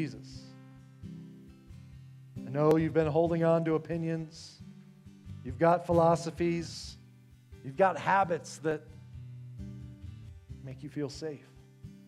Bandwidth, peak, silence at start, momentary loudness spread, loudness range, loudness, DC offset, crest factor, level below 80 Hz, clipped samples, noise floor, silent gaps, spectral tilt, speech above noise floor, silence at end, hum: 12 kHz; -12 dBFS; 0 s; 25 LU; 6 LU; -30 LUFS; under 0.1%; 20 dB; -58 dBFS; under 0.1%; -57 dBFS; none; -7 dB/octave; 27 dB; 0.1 s; none